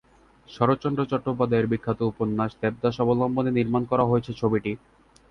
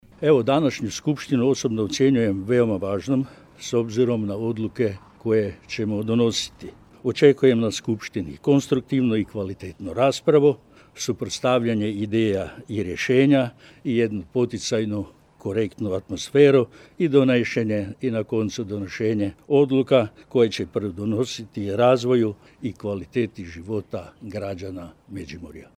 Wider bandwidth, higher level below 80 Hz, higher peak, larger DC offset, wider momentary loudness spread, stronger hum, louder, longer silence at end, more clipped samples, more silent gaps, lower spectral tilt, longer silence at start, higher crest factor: second, 6.4 kHz vs 13 kHz; about the same, -54 dBFS vs -56 dBFS; about the same, -6 dBFS vs -4 dBFS; neither; second, 4 LU vs 14 LU; neither; second, -25 LUFS vs -22 LUFS; first, 0.55 s vs 0.15 s; neither; neither; first, -9 dB/octave vs -6 dB/octave; first, 0.5 s vs 0.2 s; about the same, 20 dB vs 20 dB